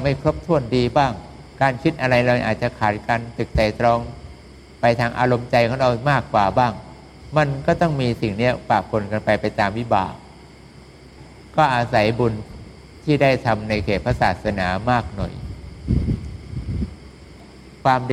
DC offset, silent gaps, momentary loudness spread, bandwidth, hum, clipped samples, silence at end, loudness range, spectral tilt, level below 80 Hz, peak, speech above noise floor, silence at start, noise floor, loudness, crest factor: under 0.1%; none; 12 LU; 12 kHz; none; under 0.1%; 0 s; 4 LU; -7 dB/octave; -38 dBFS; -2 dBFS; 24 dB; 0 s; -44 dBFS; -20 LUFS; 20 dB